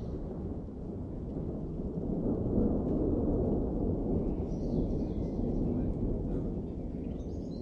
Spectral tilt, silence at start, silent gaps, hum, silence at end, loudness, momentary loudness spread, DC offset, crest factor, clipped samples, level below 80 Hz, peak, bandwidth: -11.5 dB/octave; 0 s; none; none; 0 s; -34 LUFS; 9 LU; under 0.1%; 16 dB; under 0.1%; -40 dBFS; -18 dBFS; 6.6 kHz